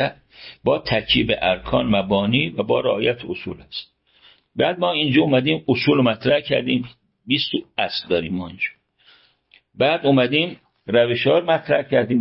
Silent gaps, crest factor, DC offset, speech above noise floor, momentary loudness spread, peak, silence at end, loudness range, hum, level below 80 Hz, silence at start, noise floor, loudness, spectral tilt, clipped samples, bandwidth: none; 16 dB; under 0.1%; 38 dB; 12 LU; -4 dBFS; 0 s; 3 LU; none; -48 dBFS; 0 s; -57 dBFS; -20 LUFS; -10.5 dB/octave; under 0.1%; 5.8 kHz